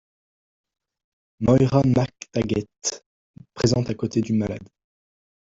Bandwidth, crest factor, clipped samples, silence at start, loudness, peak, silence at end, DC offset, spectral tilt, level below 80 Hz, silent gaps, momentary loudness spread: 8 kHz; 20 dB; under 0.1%; 1.4 s; -23 LUFS; -4 dBFS; 0.75 s; under 0.1%; -6 dB/octave; -50 dBFS; 3.06-3.34 s; 10 LU